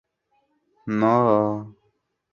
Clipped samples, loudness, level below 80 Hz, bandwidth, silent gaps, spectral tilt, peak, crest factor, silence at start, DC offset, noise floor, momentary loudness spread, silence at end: under 0.1%; -21 LUFS; -64 dBFS; 7 kHz; none; -9 dB/octave; -4 dBFS; 20 dB; 0.85 s; under 0.1%; -70 dBFS; 15 LU; 0.6 s